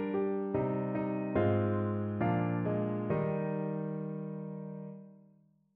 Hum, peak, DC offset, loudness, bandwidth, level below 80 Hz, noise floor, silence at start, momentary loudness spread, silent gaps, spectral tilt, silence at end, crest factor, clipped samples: none; -18 dBFS; under 0.1%; -34 LUFS; 4 kHz; -64 dBFS; -66 dBFS; 0 s; 12 LU; none; -9 dB/octave; 0.6 s; 16 dB; under 0.1%